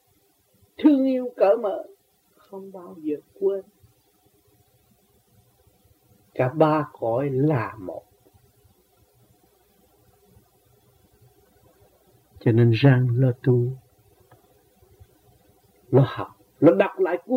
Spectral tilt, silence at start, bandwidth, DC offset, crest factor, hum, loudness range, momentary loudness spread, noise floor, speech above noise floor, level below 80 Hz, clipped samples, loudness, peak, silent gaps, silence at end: -9.5 dB/octave; 0.8 s; 5 kHz; under 0.1%; 22 dB; none; 11 LU; 20 LU; -64 dBFS; 43 dB; -64 dBFS; under 0.1%; -22 LUFS; -4 dBFS; none; 0 s